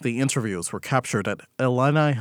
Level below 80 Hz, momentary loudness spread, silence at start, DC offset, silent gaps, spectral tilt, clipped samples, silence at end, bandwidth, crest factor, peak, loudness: -68 dBFS; 8 LU; 0 s; under 0.1%; none; -5.5 dB/octave; under 0.1%; 0 s; 16 kHz; 18 dB; -4 dBFS; -24 LUFS